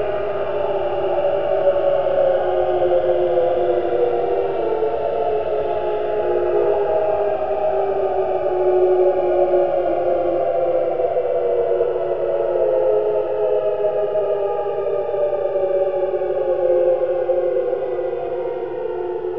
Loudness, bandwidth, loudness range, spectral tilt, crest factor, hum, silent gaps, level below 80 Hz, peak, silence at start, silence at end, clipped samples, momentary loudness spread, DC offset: -19 LUFS; 5.2 kHz; 2 LU; -9 dB/octave; 14 dB; none; none; -48 dBFS; -4 dBFS; 0 s; 0 s; under 0.1%; 5 LU; 2%